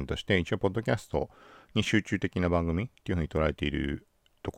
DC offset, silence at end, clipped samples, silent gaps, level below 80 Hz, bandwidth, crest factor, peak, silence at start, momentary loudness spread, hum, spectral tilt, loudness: under 0.1%; 0.05 s; under 0.1%; none; -44 dBFS; 14 kHz; 20 dB; -10 dBFS; 0 s; 7 LU; none; -6 dB/octave; -30 LUFS